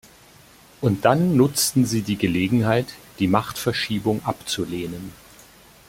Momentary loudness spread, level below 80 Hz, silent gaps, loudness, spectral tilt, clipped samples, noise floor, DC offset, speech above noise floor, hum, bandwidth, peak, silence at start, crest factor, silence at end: 11 LU; -52 dBFS; none; -22 LUFS; -5 dB/octave; under 0.1%; -50 dBFS; under 0.1%; 29 dB; none; 16.5 kHz; -2 dBFS; 0.8 s; 20 dB; 0.75 s